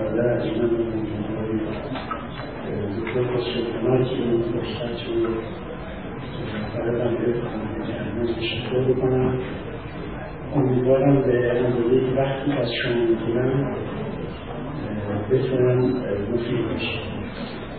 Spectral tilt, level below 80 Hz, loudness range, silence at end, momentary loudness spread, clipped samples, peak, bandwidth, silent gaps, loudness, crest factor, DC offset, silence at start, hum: -11.5 dB/octave; -44 dBFS; 5 LU; 0 s; 12 LU; under 0.1%; -8 dBFS; 4.7 kHz; none; -24 LUFS; 16 dB; 0.6%; 0 s; none